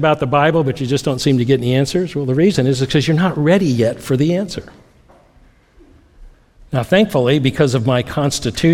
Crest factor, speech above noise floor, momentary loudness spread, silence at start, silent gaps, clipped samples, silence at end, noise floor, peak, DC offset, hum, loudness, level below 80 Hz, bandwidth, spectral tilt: 16 dB; 35 dB; 5 LU; 0 s; none; under 0.1%; 0 s; -50 dBFS; 0 dBFS; under 0.1%; none; -16 LUFS; -44 dBFS; 15.5 kHz; -6 dB/octave